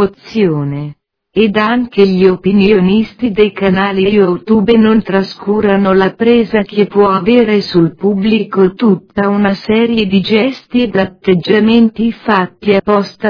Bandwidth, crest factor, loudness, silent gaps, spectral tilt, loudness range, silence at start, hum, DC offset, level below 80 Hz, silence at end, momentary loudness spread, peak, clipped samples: 5.4 kHz; 10 dB; -11 LUFS; none; -8.5 dB/octave; 1 LU; 0 s; none; under 0.1%; -42 dBFS; 0 s; 6 LU; 0 dBFS; 0.2%